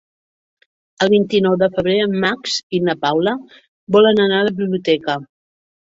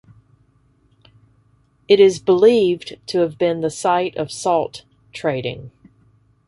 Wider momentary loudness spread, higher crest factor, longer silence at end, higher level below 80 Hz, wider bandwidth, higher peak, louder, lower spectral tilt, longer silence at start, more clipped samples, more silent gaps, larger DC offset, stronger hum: second, 8 LU vs 16 LU; about the same, 16 dB vs 18 dB; second, 0.6 s vs 0.8 s; about the same, -56 dBFS vs -58 dBFS; second, 7.8 kHz vs 11.5 kHz; about the same, -2 dBFS vs -2 dBFS; about the same, -17 LUFS vs -18 LUFS; about the same, -5.5 dB/octave vs -5 dB/octave; second, 1 s vs 1.9 s; neither; first, 2.63-2.70 s, 3.68-3.87 s vs none; neither; neither